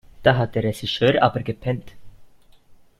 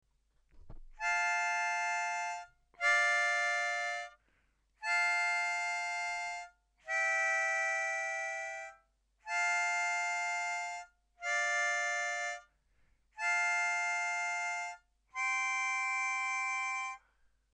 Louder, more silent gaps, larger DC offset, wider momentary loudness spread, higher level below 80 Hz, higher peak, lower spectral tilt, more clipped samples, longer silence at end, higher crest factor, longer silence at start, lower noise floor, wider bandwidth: first, -21 LUFS vs -33 LUFS; neither; neither; about the same, 10 LU vs 12 LU; first, -48 dBFS vs -66 dBFS; first, 0 dBFS vs -18 dBFS; first, -6.5 dB/octave vs 2 dB/octave; neither; second, 0.25 s vs 0.55 s; first, 22 dB vs 16 dB; second, 0.2 s vs 0.55 s; second, -50 dBFS vs -74 dBFS; about the same, 13.5 kHz vs 12.5 kHz